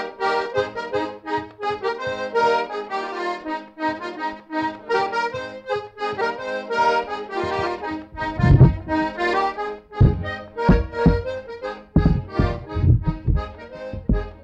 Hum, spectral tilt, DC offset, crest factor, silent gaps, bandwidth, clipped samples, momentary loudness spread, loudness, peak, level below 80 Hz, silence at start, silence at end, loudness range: none; -8 dB/octave; under 0.1%; 20 dB; none; 8.2 kHz; under 0.1%; 10 LU; -23 LUFS; 0 dBFS; -30 dBFS; 0 s; 0 s; 6 LU